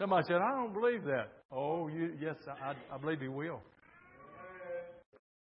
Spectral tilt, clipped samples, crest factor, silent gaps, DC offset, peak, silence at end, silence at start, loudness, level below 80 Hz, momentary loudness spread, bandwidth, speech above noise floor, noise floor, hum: -5 dB/octave; under 0.1%; 20 dB; 1.45-1.49 s; under 0.1%; -18 dBFS; 0.55 s; 0 s; -37 LUFS; -78 dBFS; 18 LU; 5.4 kHz; 24 dB; -60 dBFS; none